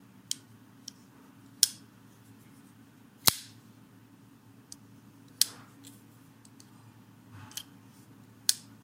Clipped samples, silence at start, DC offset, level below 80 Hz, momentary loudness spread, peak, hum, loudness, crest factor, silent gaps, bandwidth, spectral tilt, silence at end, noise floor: under 0.1%; 0.3 s; under 0.1%; -72 dBFS; 27 LU; 0 dBFS; none; -30 LUFS; 38 dB; none; 16.5 kHz; 0 dB/octave; 0.25 s; -57 dBFS